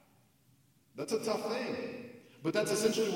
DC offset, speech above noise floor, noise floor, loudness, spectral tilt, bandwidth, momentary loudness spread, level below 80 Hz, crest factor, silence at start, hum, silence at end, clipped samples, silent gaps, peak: under 0.1%; 35 dB; -68 dBFS; -34 LUFS; -4 dB/octave; 16.5 kHz; 17 LU; -78 dBFS; 18 dB; 0.95 s; none; 0 s; under 0.1%; none; -18 dBFS